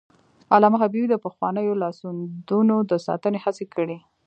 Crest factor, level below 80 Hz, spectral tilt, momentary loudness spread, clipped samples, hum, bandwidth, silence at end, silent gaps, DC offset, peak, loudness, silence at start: 20 dB; -74 dBFS; -8 dB/octave; 12 LU; under 0.1%; none; 8.2 kHz; 0.3 s; none; under 0.1%; -2 dBFS; -22 LUFS; 0.5 s